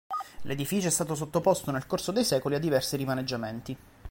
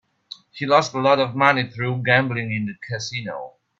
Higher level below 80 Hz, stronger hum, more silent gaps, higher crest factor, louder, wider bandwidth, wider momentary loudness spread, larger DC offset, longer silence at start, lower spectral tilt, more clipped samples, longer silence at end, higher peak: first, -56 dBFS vs -62 dBFS; neither; neither; about the same, 18 dB vs 22 dB; second, -29 LUFS vs -20 LUFS; first, 17 kHz vs 7.8 kHz; second, 10 LU vs 17 LU; neither; second, 0.1 s vs 0.55 s; about the same, -4.5 dB/octave vs -5 dB/octave; neither; second, 0 s vs 0.3 s; second, -10 dBFS vs 0 dBFS